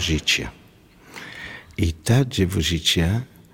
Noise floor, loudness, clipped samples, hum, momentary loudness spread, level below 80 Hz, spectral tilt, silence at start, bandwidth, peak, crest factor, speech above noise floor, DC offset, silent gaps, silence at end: -50 dBFS; -21 LUFS; under 0.1%; none; 17 LU; -36 dBFS; -4.5 dB/octave; 0 s; 17 kHz; -6 dBFS; 18 dB; 29 dB; under 0.1%; none; 0.25 s